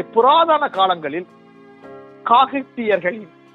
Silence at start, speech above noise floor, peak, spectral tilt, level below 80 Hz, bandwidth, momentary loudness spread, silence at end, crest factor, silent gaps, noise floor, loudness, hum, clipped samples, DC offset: 0 s; 26 dB; 0 dBFS; -6.5 dB/octave; -70 dBFS; 5.2 kHz; 15 LU; 0.3 s; 18 dB; none; -42 dBFS; -17 LUFS; none; under 0.1%; under 0.1%